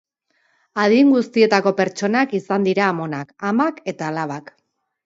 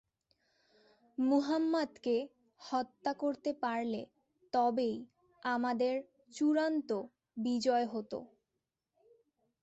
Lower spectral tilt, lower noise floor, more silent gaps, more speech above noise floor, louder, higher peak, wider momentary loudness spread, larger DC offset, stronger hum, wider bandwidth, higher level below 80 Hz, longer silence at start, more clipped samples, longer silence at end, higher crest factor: about the same, -6 dB/octave vs -5 dB/octave; second, -65 dBFS vs -88 dBFS; neither; second, 47 dB vs 54 dB; first, -19 LUFS vs -35 LUFS; first, -2 dBFS vs -20 dBFS; about the same, 13 LU vs 14 LU; neither; neither; about the same, 7.8 kHz vs 8.2 kHz; first, -70 dBFS vs -80 dBFS; second, 0.75 s vs 1.2 s; neither; second, 0.65 s vs 1.35 s; about the same, 18 dB vs 16 dB